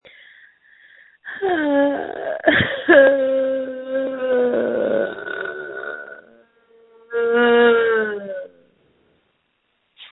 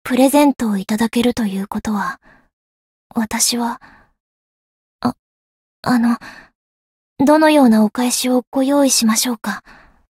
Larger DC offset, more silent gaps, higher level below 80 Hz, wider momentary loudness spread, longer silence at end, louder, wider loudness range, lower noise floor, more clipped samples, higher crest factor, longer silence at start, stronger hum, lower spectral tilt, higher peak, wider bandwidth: neither; second, none vs 2.53-3.10 s, 4.20-4.99 s, 5.19-5.83 s, 6.55-7.16 s, 8.47-8.52 s; second, -58 dBFS vs -52 dBFS; first, 17 LU vs 13 LU; second, 0.05 s vs 0.55 s; about the same, -18 LUFS vs -16 LUFS; about the same, 6 LU vs 8 LU; second, -68 dBFS vs under -90 dBFS; neither; about the same, 20 dB vs 16 dB; first, 1.25 s vs 0.05 s; neither; first, -10 dB/octave vs -3.5 dB/octave; about the same, 0 dBFS vs 0 dBFS; second, 4.1 kHz vs 16.5 kHz